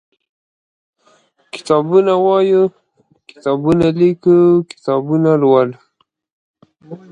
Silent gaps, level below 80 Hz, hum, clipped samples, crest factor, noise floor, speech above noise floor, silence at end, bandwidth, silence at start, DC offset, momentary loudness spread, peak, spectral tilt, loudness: 6.32-6.54 s; -52 dBFS; none; under 0.1%; 16 dB; -55 dBFS; 42 dB; 0.15 s; 9.6 kHz; 1.55 s; under 0.1%; 9 LU; 0 dBFS; -8 dB/octave; -14 LUFS